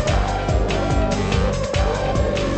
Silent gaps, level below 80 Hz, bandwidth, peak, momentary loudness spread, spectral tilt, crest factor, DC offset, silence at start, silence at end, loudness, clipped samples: none; -24 dBFS; 8.8 kHz; -6 dBFS; 1 LU; -6 dB/octave; 12 dB; under 0.1%; 0 s; 0 s; -21 LUFS; under 0.1%